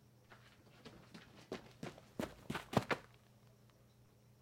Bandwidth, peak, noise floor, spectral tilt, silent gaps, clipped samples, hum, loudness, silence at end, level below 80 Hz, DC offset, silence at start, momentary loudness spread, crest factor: 16.5 kHz; -18 dBFS; -67 dBFS; -5.5 dB/octave; none; under 0.1%; none; -44 LUFS; 0.9 s; -70 dBFS; under 0.1%; 0.3 s; 27 LU; 30 dB